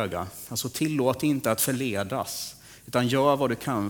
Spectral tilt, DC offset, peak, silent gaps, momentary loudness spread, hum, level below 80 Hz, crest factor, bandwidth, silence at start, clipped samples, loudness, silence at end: -4.5 dB/octave; under 0.1%; -8 dBFS; none; 11 LU; none; -58 dBFS; 18 dB; over 20 kHz; 0 s; under 0.1%; -26 LUFS; 0 s